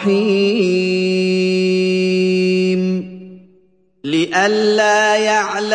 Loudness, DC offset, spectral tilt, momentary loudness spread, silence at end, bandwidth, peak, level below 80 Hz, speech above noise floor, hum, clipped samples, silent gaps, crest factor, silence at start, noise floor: -15 LUFS; under 0.1%; -5 dB/octave; 6 LU; 0 s; 9.8 kHz; -2 dBFS; -64 dBFS; 41 dB; none; under 0.1%; none; 14 dB; 0 s; -55 dBFS